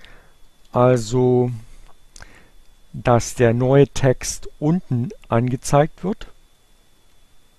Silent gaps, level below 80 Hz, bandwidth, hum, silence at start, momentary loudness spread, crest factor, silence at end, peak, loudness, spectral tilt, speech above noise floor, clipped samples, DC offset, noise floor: none; -40 dBFS; 13 kHz; none; 0.15 s; 12 LU; 20 dB; 1.3 s; -2 dBFS; -19 LUFS; -6.5 dB/octave; 35 dB; under 0.1%; under 0.1%; -53 dBFS